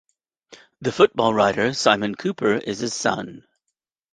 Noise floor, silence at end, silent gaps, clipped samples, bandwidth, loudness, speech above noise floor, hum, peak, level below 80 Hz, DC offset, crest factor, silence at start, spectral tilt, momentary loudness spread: -81 dBFS; 0.75 s; none; under 0.1%; 9.8 kHz; -21 LUFS; 60 dB; none; -2 dBFS; -60 dBFS; under 0.1%; 20 dB; 0.5 s; -4 dB/octave; 11 LU